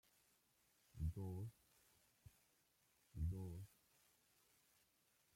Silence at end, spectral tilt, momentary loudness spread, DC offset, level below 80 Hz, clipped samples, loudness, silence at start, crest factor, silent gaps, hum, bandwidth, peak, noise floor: 1.7 s; -7.5 dB/octave; 15 LU; under 0.1%; -62 dBFS; under 0.1%; -51 LUFS; 0.95 s; 20 dB; none; none; 16.5 kHz; -34 dBFS; -81 dBFS